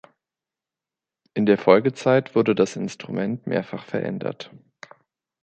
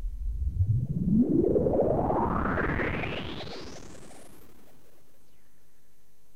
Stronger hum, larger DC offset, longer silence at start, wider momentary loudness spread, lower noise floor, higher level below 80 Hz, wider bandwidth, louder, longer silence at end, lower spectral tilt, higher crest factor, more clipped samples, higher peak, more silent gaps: neither; second, under 0.1% vs 1%; first, 1.35 s vs 0 s; second, 14 LU vs 20 LU; first, -89 dBFS vs -66 dBFS; second, -66 dBFS vs -38 dBFS; second, 9 kHz vs 15 kHz; first, -22 LUFS vs -28 LUFS; second, 0.95 s vs 2.1 s; second, -6.5 dB/octave vs -8 dB/octave; first, 22 dB vs 16 dB; neither; first, -2 dBFS vs -14 dBFS; neither